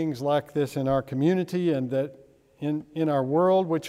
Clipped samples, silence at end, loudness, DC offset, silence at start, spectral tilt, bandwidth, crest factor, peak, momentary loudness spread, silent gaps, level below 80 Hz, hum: under 0.1%; 0 s; -26 LUFS; under 0.1%; 0 s; -7.5 dB/octave; 15 kHz; 14 dB; -12 dBFS; 9 LU; none; -60 dBFS; none